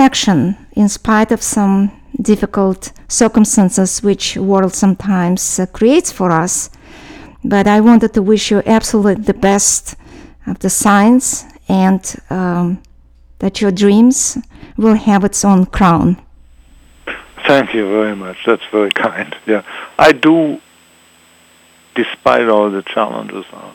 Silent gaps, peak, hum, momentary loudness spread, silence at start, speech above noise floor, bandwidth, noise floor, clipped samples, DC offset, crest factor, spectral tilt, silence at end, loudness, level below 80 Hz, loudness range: none; 0 dBFS; none; 12 LU; 0 s; 35 dB; 17 kHz; -47 dBFS; 0.5%; under 0.1%; 14 dB; -4.5 dB/octave; 0.05 s; -13 LUFS; -38 dBFS; 3 LU